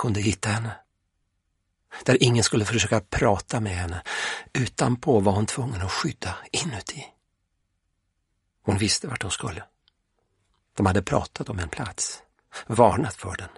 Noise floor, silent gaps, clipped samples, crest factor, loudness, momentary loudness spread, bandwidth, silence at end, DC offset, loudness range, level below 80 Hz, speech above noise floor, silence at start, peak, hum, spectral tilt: -75 dBFS; none; under 0.1%; 24 dB; -25 LUFS; 15 LU; 11.5 kHz; 0.1 s; under 0.1%; 6 LU; -48 dBFS; 50 dB; 0 s; -2 dBFS; none; -4.5 dB/octave